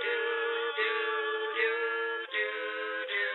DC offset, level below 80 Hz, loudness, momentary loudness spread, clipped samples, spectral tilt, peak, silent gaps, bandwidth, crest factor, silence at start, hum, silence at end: under 0.1%; under -90 dBFS; -31 LUFS; 4 LU; under 0.1%; -1 dB/octave; -18 dBFS; none; 4.2 kHz; 14 dB; 0 s; none; 0 s